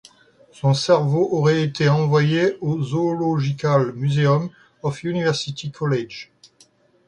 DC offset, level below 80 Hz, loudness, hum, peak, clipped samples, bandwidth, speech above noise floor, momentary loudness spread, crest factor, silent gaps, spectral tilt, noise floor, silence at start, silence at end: under 0.1%; -58 dBFS; -20 LUFS; none; -4 dBFS; under 0.1%; 9.6 kHz; 37 dB; 10 LU; 16 dB; none; -6.5 dB/octave; -56 dBFS; 0.65 s; 0.85 s